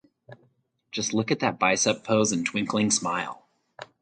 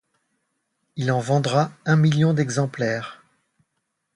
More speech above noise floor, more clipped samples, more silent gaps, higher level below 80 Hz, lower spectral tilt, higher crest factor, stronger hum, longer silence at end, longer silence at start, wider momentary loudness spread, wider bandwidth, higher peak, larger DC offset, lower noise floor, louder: second, 42 dB vs 56 dB; neither; neither; about the same, -66 dBFS vs -64 dBFS; second, -3 dB/octave vs -6.5 dB/octave; about the same, 22 dB vs 18 dB; neither; second, 0.2 s vs 1 s; second, 0.3 s vs 0.95 s; about the same, 13 LU vs 11 LU; second, 9.4 kHz vs 11 kHz; about the same, -6 dBFS vs -6 dBFS; neither; second, -67 dBFS vs -76 dBFS; second, -25 LUFS vs -22 LUFS